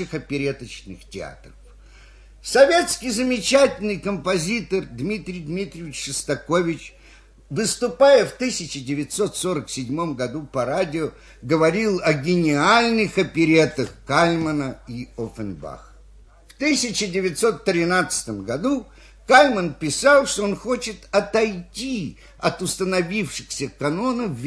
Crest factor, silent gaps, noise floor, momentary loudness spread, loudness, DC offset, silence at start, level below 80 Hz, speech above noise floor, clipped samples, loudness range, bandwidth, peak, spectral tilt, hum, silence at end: 22 dB; none; -48 dBFS; 15 LU; -21 LUFS; under 0.1%; 0 s; -48 dBFS; 27 dB; under 0.1%; 6 LU; 11 kHz; 0 dBFS; -4 dB/octave; none; 0 s